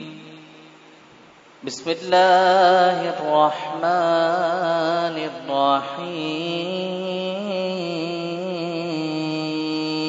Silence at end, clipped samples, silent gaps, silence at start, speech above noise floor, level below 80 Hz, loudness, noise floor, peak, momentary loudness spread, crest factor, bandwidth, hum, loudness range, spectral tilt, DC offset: 0 s; under 0.1%; none; 0 s; 29 dB; -74 dBFS; -21 LUFS; -49 dBFS; -4 dBFS; 12 LU; 18 dB; 7.8 kHz; none; 7 LU; -5 dB/octave; under 0.1%